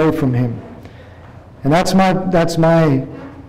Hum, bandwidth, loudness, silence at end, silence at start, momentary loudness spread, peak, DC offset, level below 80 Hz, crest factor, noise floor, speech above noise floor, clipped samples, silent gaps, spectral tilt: none; 15.5 kHz; -15 LUFS; 0 s; 0 s; 15 LU; -8 dBFS; under 0.1%; -38 dBFS; 8 dB; -38 dBFS; 24 dB; under 0.1%; none; -6.5 dB/octave